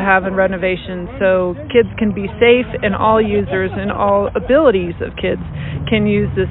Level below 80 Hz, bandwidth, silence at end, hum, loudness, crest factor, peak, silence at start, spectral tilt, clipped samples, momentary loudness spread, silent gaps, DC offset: -34 dBFS; 4.1 kHz; 0 s; none; -16 LUFS; 14 dB; 0 dBFS; 0 s; -11.5 dB/octave; under 0.1%; 9 LU; none; under 0.1%